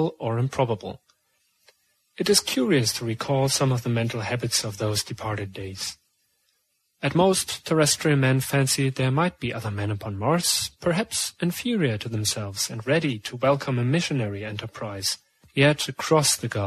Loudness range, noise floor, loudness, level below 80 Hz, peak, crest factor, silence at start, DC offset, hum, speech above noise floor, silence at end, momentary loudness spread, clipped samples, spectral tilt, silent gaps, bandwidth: 4 LU; -72 dBFS; -24 LUFS; -58 dBFS; -4 dBFS; 20 dB; 0 s; under 0.1%; none; 48 dB; 0 s; 10 LU; under 0.1%; -4 dB/octave; none; 13.5 kHz